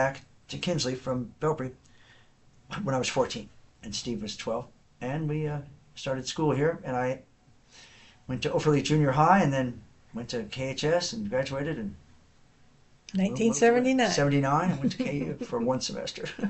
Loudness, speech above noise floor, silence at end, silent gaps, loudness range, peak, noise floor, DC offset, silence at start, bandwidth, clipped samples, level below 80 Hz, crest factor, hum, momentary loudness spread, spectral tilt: -28 LUFS; 31 dB; 0 s; none; 7 LU; -8 dBFS; -58 dBFS; under 0.1%; 0 s; 8.2 kHz; under 0.1%; -56 dBFS; 22 dB; none; 16 LU; -5.5 dB/octave